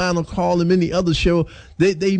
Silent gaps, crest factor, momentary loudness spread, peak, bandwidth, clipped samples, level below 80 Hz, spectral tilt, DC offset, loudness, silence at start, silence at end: none; 12 dB; 4 LU; -6 dBFS; 9.2 kHz; under 0.1%; -34 dBFS; -6 dB/octave; under 0.1%; -19 LUFS; 0 s; 0 s